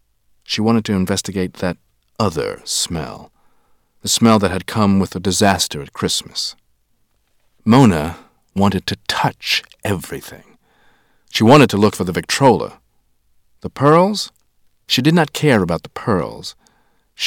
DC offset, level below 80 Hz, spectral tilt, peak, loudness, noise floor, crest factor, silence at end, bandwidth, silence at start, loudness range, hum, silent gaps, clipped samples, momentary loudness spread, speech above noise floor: under 0.1%; -48 dBFS; -5 dB/octave; 0 dBFS; -16 LUFS; -62 dBFS; 18 dB; 0 s; 18 kHz; 0.5 s; 4 LU; none; none; under 0.1%; 15 LU; 46 dB